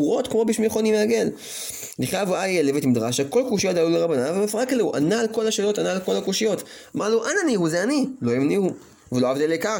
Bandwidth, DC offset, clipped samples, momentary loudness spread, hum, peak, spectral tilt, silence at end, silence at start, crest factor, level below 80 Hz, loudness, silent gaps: 17 kHz; under 0.1%; under 0.1%; 7 LU; none; -8 dBFS; -4.5 dB/octave; 0 s; 0 s; 14 dB; -62 dBFS; -22 LUFS; none